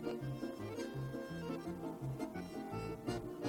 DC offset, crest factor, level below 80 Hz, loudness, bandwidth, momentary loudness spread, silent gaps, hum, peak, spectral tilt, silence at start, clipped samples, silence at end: under 0.1%; 18 dB; -62 dBFS; -44 LUFS; 18 kHz; 2 LU; none; none; -26 dBFS; -7 dB/octave; 0 s; under 0.1%; 0 s